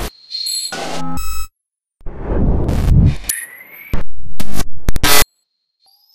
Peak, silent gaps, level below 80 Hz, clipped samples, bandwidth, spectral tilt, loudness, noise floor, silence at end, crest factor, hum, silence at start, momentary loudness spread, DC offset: 0 dBFS; none; -22 dBFS; under 0.1%; 16 kHz; -4 dB/octave; -18 LUFS; -79 dBFS; 0 s; 12 dB; none; 0 s; 18 LU; under 0.1%